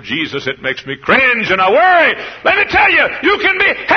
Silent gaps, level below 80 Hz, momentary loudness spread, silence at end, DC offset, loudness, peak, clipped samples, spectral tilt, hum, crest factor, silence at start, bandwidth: none; -44 dBFS; 10 LU; 0 s; under 0.1%; -11 LUFS; 0 dBFS; under 0.1%; -4.5 dB/octave; none; 12 dB; 0 s; 6.6 kHz